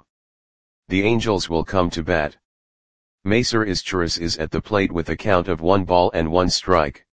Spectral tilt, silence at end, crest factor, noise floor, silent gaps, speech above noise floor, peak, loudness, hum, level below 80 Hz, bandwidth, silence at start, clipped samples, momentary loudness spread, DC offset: -5 dB/octave; 0.1 s; 20 dB; under -90 dBFS; 0.09-0.83 s, 2.45-3.18 s; over 70 dB; 0 dBFS; -20 LUFS; none; -40 dBFS; 10 kHz; 0 s; under 0.1%; 5 LU; 1%